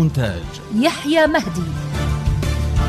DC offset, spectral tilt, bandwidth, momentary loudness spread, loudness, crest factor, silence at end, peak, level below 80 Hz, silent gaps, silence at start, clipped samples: under 0.1%; -6 dB/octave; 14 kHz; 9 LU; -19 LUFS; 16 dB; 0 s; -4 dBFS; -28 dBFS; none; 0 s; under 0.1%